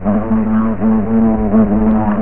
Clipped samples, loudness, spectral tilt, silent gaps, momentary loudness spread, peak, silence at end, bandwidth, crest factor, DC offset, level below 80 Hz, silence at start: under 0.1%; -13 LUFS; -13.5 dB/octave; none; 3 LU; 0 dBFS; 0 s; 3 kHz; 12 dB; 6%; -28 dBFS; 0 s